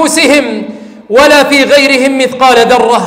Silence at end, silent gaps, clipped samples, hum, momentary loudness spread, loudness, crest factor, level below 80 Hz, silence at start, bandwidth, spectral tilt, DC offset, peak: 0 s; none; 0.3%; none; 10 LU; -6 LUFS; 6 dB; -42 dBFS; 0 s; 16.5 kHz; -2.5 dB/octave; under 0.1%; 0 dBFS